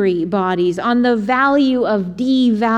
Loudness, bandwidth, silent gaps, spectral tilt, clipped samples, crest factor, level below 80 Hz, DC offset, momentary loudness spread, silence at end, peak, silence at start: -16 LUFS; 8.6 kHz; none; -7 dB/octave; under 0.1%; 12 dB; -52 dBFS; under 0.1%; 4 LU; 0 s; -2 dBFS; 0 s